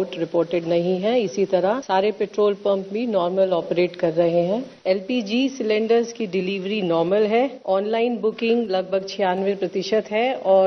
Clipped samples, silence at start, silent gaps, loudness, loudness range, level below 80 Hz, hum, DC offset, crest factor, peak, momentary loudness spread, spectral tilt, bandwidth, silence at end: under 0.1%; 0 s; none; -22 LUFS; 1 LU; -66 dBFS; none; under 0.1%; 16 dB; -6 dBFS; 5 LU; -6 dB/octave; 6.6 kHz; 0 s